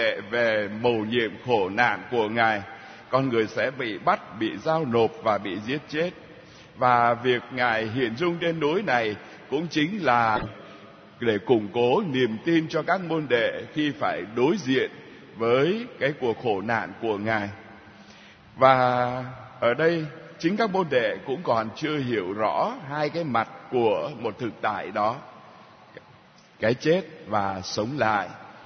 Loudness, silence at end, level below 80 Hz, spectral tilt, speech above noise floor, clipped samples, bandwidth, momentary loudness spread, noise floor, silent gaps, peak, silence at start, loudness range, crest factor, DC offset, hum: -25 LUFS; 0 s; -62 dBFS; -6 dB/octave; 28 dB; under 0.1%; 6.6 kHz; 8 LU; -53 dBFS; none; -2 dBFS; 0 s; 3 LU; 22 dB; under 0.1%; none